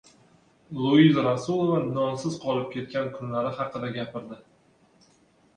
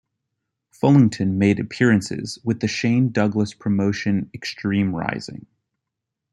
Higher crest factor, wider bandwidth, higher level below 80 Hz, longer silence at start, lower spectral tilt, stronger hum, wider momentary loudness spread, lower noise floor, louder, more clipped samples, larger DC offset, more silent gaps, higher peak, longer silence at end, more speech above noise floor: about the same, 20 dB vs 18 dB; about the same, 10 kHz vs 11 kHz; second, -64 dBFS vs -58 dBFS; second, 0.7 s vs 0.85 s; about the same, -7 dB/octave vs -6.5 dB/octave; neither; first, 17 LU vs 11 LU; second, -61 dBFS vs -82 dBFS; second, -25 LUFS vs -21 LUFS; neither; neither; neither; second, -6 dBFS vs -2 dBFS; first, 1.2 s vs 0.95 s; second, 37 dB vs 63 dB